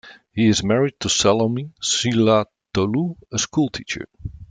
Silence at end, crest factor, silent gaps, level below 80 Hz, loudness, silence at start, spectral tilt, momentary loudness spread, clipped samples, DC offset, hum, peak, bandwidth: 0.05 s; 18 dB; none; -48 dBFS; -20 LUFS; 0.05 s; -4 dB/octave; 12 LU; under 0.1%; under 0.1%; none; -4 dBFS; 9.6 kHz